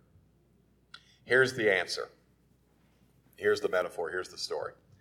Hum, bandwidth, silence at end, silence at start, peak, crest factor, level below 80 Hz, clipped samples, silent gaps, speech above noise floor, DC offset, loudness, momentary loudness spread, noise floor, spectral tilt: none; 15.5 kHz; 0.3 s; 0.95 s; -12 dBFS; 22 dB; -72 dBFS; under 0.1%; none; 37 dB; under 0.1%; -30 LUFS; 14 LU; -67 dBFS; -3.5 dB/octave